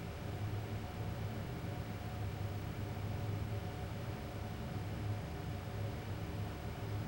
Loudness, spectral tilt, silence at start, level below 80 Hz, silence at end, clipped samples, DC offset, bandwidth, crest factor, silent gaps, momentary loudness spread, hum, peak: -43 LUFS; -6.5 dB/octave; 0 s; -52 dBFS; 0 s; under 0.1%; under 0.1%; 16 kHz; 12 dB; none; 3 LU; none; -28 dBFS